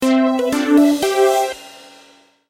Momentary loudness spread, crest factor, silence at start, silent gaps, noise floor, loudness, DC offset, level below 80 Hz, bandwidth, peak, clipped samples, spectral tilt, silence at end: 9 LU; 14 dB; 0 s; none; -50 dBFS; -15 LUFS; under 0.1%; -56 dBFS; 16.5 kHz; -4 dBFS; under 0.1%; -3.5 dB/octave; 0.75 s